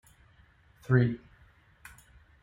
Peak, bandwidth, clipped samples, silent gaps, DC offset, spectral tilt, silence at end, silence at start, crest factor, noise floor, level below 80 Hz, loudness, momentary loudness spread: -10 dBFS; 11 kHz; under 0.1%; none; under 0.1%; -8.5 dB/octave; 1.25 s; 0.9 s; 22 dB; -61 dBFS; -60 dBFS; -28 LUFS; 26 LU